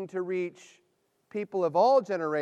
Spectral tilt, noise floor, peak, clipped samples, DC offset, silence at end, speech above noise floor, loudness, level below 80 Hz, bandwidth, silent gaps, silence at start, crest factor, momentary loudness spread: -6.5 dB/octave; -65 dBFS; -12 dBFS; under 0.1%; under 0.1%; 0 s; 37 dB; -27 LUFS; -86 dBFS; 9 kHz; none; 0 s; 16 dB; 15 LU